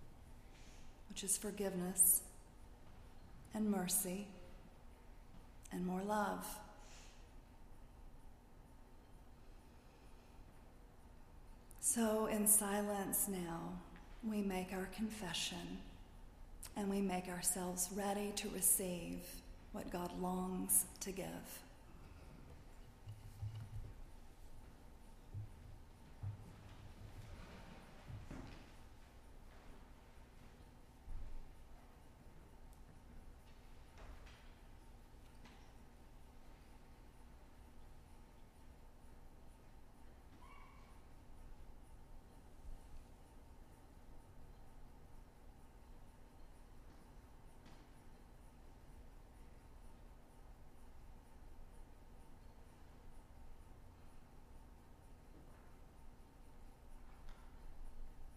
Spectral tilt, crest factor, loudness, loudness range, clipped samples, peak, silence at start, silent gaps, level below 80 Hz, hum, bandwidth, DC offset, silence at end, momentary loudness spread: -3.5 dB/octave; 28 dB; -40 LUFS; 26 LU; under 0.1%; -18 dBFS; 0 s; none; -58 dBFS; none; 15.5 kHz; under 0.1%; 0 s; 26 LU